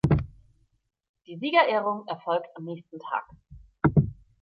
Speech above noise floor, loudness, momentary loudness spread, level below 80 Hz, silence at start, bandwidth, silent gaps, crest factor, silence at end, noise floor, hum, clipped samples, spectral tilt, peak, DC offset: 35 dB; -26 LUFS; 17 LU; -44 dBFS; 0.05 s; 5.8 kHz; 1.09-1.14 s; 20 dB; 0.3 s; -63 dBFS; none; under 0.1%; -8.5 dB/octave; -6 dBFS; under 0.1%